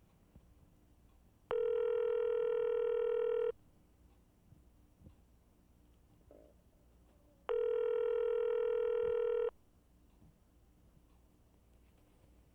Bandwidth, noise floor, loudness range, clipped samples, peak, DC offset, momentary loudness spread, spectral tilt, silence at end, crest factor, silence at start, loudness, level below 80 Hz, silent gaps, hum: 3.5 kHz; -67 dBFS; 8 LU; under 0.1%; -22 dBFS; under 0.1%; 6 LU; -6 dB/octave; 3.05 s; 18 dB; 0.35 s; -36 LUFS; -68 dBFS; none; 60 Hz at -70 dBFS